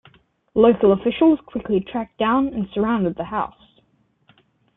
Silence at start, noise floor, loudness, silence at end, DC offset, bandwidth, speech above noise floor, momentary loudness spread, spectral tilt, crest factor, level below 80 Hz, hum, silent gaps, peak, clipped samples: 0.55 s; -63 dBFS; -20 LUFS; 1.3 s; under 0.1%; 3.9 kHz; 44 dB; 10 LU; -11 dB/octave; 18 dB; -50 dBFS; none; none; -2 dBFS; under 0.1%